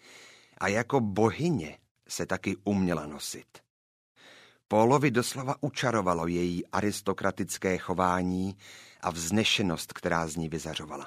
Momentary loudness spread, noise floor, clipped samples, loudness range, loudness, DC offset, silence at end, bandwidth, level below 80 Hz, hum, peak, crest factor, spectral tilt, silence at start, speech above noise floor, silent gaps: 11 LU; -56 dBFS; under 0.1%; 3 LU; -29 LUFS; under 0.1%; 0 s; 15.5 kHz; -58 dBFS; none; -8 dBFS; 22 dB; -5 dB/octave; 0.1 s; 27 dB; 1.91-1.95 s, 3.70-4.15 s